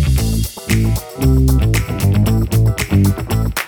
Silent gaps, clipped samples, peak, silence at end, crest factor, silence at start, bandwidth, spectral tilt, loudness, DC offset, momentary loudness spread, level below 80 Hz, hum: none; under 0.1%; 0 dBFS; 0 s; 14 dB; 0 s; 19.5 kHz; -6 dB/octave; -16 LUFS; under 0.1%; 5 LU; -20 dBFS; none